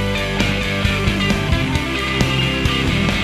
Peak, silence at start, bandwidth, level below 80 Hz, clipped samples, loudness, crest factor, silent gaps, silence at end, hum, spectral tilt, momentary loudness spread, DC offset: -2 dBFS; 0 s; 14 kHz; -26 dBFS; under 0.1%; -18 LUFS; 16 dB; none; 0 s; none; -5 dB/octave; 2 LU; under 0.1%